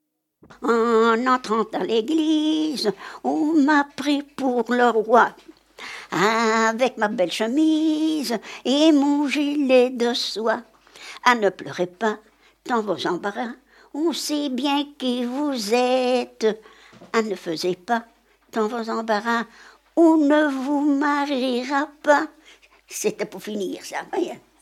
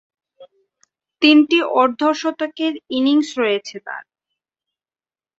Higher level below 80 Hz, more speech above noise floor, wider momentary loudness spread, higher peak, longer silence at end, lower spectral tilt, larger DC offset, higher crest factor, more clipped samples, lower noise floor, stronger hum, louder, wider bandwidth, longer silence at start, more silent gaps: about the same, -70 dBFS vs -68 dBFS; second, 31 dB vs over 73 dB; second, 11 LU vs 18 LU; about the same, -2 dBFS vs -2 dBFS; second, 0.25 s vs 1.4 s; about the same, -4 dB/octave vs -3 dB/octave; neither; about the same, 20 dB vs 18 dB; neither; second, -52 dBFS vs under -90 dBFS; neither; second, -22 LUFS vs -17 LUFS; first, 15 kHz vs 7.8 kHz; about the same, 0.5 s vs 0.4 s; neither